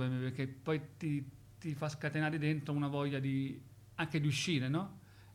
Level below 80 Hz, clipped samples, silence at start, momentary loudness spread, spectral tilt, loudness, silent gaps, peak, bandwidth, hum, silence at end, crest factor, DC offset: -70 dBFS; under 0.1%; 0 s; 13 LU; -6 dB/octave; -37 LUFS; none; -22 dBFS; 13.5 kHz; none; 0 s; 14 dB; under 0.1%